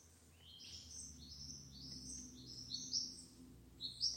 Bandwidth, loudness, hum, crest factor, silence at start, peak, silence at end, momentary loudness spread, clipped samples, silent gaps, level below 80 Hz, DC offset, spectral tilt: 16.5 kHz; -47 LUFS; none; 22 dB; 0 s; -28 dBFS; 0 s; 19 LU; under 0.1%; none; -66 dBFS; under 0.1%; -1.5 dB/octave